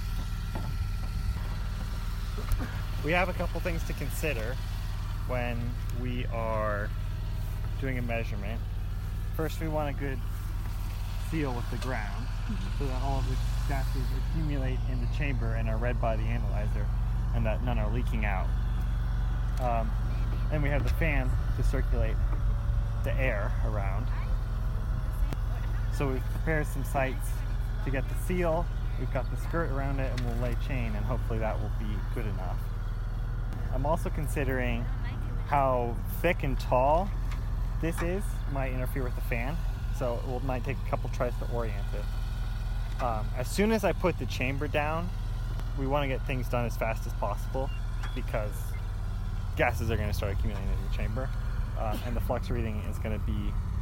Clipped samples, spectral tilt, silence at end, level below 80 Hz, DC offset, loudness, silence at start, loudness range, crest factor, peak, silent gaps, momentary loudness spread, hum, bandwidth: under 0.1%; -6.5 dB/octave; 0 s; -32 dBFS; under 0.1%; -32 LUFS; 0 s; 4 LU; 18 dB; -10 dBFS; none; 7 LU; none; 16 kHz